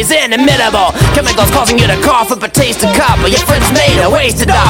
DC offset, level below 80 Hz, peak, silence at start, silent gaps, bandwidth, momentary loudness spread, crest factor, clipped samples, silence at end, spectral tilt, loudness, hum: under 0.1%; -20 dBFS; 0 dBFS; 0 s; none; 17.5 kHz; 2 LU; 8 dB; under 0.1%; 0 s; -4 dB/octave; -9 LUFS; none